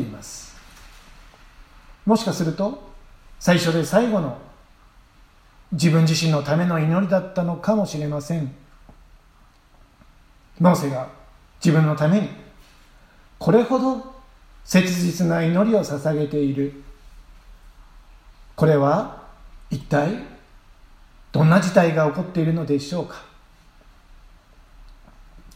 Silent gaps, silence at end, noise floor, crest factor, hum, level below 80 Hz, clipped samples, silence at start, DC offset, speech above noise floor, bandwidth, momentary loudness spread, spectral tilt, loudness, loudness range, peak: none; 0.15 s; -53 dBFS; 22 dB; none; -48 dBFS; under 0.1%; 0 s; under 0.1%; 33 dB; 15.5 kHz; 15 LU; -6.5 dB/octave; -21 LUFS; 5 LU; 0 dBFS